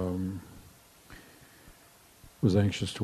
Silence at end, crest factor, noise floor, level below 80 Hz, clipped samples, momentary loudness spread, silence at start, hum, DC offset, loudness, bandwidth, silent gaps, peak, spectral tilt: 0 s; 20 dB; -58 dBFS; -60 dBFS; under 0.1%; 26 LU; 0 s; none; under 0.1%; -30 LUFS; 13.5 kHz; none; -12 dBFS; -6.5 dB/octave